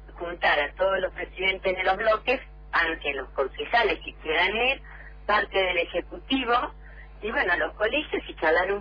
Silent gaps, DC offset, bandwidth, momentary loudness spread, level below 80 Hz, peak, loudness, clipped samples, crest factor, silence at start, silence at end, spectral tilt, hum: none; under 0.1%; 5.2 kHz; 9 LU; -46 dBFS; -12 dBFS; -25 LUFS; under 0.1%; 16 dB; 0 s; 0 s; -5.5 dB/octave; none